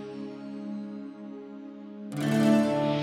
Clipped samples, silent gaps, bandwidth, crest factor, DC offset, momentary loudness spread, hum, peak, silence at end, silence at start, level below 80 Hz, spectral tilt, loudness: under 0.1%; none; 14.5 kHz; 16 dB; under 0.1%; 20 LU; none; -12 dBFS; 0 s; 0 s; -66 dBFS; -6.5 dB/octave; -28 LUFS